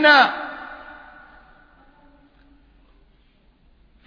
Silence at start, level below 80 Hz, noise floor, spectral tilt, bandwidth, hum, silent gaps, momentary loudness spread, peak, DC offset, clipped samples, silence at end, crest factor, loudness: 0 s; -56 dBFS; -57 dBFS; -3 dB/octave; 5.4 kHz; none; none; 29 LU; -2 dBFS; under 0.1%; under 0.1%; 3.3 s; 22 dB; -17 LUFS